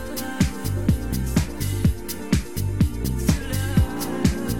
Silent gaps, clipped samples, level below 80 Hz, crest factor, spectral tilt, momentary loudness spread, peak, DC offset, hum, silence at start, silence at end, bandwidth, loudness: none; under 0.1%; -30 dBFS; 18 dB; -6 dB/octave; 3 LU; -4 dBFS; 1%; none; 0 s; 0 s; 18 kHz; -24 LUFS